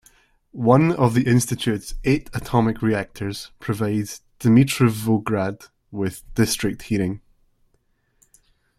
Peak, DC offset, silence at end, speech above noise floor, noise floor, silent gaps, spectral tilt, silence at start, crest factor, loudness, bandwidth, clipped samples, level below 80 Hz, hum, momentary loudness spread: -2 dBFS; under 0.1%; 1.6 s; 45 dB; -66 dBFS; none; -6 dB/octave; 0.55 s; 20 dB; -21 LUFS; 15.5 kHz; under 0.1%; -44 dBFS; none; 13 LU